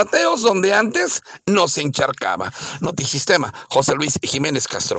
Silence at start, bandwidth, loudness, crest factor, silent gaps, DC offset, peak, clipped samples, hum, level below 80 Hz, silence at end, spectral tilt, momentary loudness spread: 0 s; 9.4 kHz; -19 LUFS; 16 dB; none; under 0.1%; -2 dBFS; under 0.1%; none; -56 dBFS; 0 s; -3 dB/octave; 8 LU